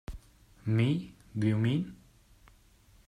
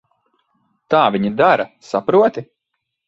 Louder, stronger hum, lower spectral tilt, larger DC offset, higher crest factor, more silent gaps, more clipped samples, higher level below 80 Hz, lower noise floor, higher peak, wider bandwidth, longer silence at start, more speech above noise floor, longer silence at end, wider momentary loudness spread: second, -31 LUFS vs -16 LUFS; neither; first, -8 dB/octave vs -6.5 dB/octave; neither; about the same, 16 dB vs 18 dB; neither; neither; first, -54 dBFS vs -60 dBFS; second, -61 dBFS vs -76 dBFS; second, -16 dBFS vs 0 dBFS; first, 10.5 kHz vs 8 kHz; second, 0.1 s vs 0.9 s; second, 33 dB vs 61 dB; first, 1.15 s vs 0.65 s; first, 16 LU vs 8 LU